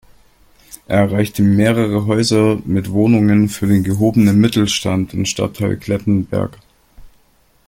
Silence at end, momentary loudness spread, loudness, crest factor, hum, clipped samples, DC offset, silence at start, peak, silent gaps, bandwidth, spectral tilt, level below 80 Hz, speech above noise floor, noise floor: 0.6 s; 7 LU; -15 LUFS; 14 dB; none; under 0.1%; under 0.1%; 0.7 s; 0 dBFS; none; 16.5 kHz; -6 dB/octave; -44 dBFS; 40 dB; -54 dBFS